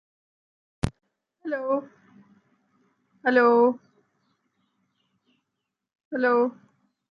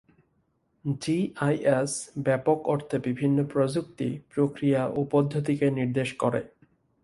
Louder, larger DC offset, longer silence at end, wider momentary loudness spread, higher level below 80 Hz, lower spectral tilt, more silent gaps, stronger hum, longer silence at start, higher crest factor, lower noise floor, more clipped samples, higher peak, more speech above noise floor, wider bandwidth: first, -24 LUFS vs -27 LUFS; neither; about the same, 0.6 s vs 0.55 s; first, 15 LU vs 7 LU; first, -54 dBFS vs -62 dBFS; about the same, -7 dB/octave vs -6.5 dB/octave; first, 6.05-6.11 s vs none; neither; about the same, 0.85 s vs 0.85 s; about the same, 20 dB vs 18 dB; first, -83 dBFS vs -71 dBFS; neither; about the same, -8 dBFS vs -10 dBFS; first, 61 dB vs 45 dB; about the same, 11 kHz vs 11.5 kHz